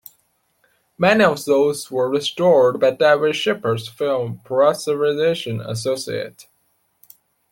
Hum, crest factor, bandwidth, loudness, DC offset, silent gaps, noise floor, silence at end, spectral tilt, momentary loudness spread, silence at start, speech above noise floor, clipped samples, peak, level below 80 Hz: none; 18 dB; 17 kHz; -18 LUFS; under 0.1%; none; -66 dBFS; 1.1 s; -5 dB/octave; 10 LU; 1 s; 47 dB; under 0.1%; -2 dBFS; -62 dBFS